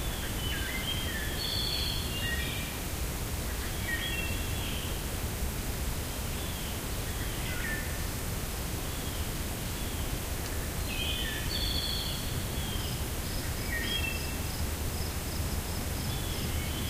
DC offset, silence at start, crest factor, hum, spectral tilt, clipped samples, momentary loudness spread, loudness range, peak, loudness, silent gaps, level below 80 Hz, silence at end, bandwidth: under 0.1%; 0 s; 14 dB; none; -3.5 dB/octave; under 0.1%; 4 LU; 2 LU; -20 dBFS; -33 LUFS; none; -38 dBFS; 0 s; 16 kHz